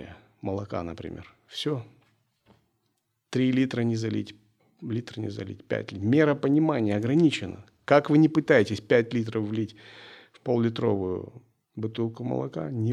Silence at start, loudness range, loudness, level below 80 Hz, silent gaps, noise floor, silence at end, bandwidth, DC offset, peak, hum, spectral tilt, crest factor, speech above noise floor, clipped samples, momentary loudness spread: 0 s; 8 LU; -26 LUFS; -68 dBFS; none; -76 dBFS; 0 s; 10.5 kHz; under 0.1%; -4 dBFS; none; -7 dB/octave; 24 dB; 50 dB; under 0.1%; 18 LU